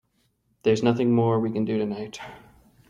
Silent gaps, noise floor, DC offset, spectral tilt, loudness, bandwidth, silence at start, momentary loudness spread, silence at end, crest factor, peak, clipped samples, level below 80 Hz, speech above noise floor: none; -69 dBFS; under 0.1%; -7.5 dB/octave; -24 LUFS; 8.6 kHz; 0.65 s; 16 LU; 0.5 s; 18 dB; -8 dBFS; under 0.1%; -60 dBFS; 46 dB